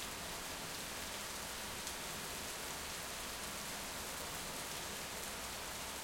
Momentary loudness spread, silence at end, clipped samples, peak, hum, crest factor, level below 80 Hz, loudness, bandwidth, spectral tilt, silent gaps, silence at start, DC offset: 1 LU; 0 s; under 0.1%; -22 dBFS; none; 22 dB; -60 dBFS; -43 LUFS; 17 kHz; -1.5 dB/octave; none; 0 s; under 0.1%